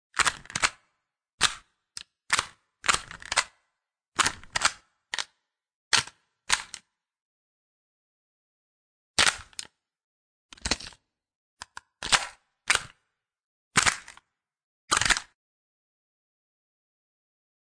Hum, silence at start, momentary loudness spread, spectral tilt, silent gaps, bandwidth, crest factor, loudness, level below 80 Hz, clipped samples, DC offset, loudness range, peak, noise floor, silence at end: none; 0.15 s; 20 LU; 0 dB/octave; 1.34-1.38 s, 4.08-4.12 s, 5.75-5.91 s, 7.22-9.14 s, 10.04-10.49 s, 11.35-11.57 s, 13.44-13.71 s, 14.64-14.88 s; 10.5 kHz; 28 dB; -26 LUFS; -54 dBFS; under 0.1%; under 0.1%; 4 LU; -4 dBFS; -83 dBFS; 2.5 s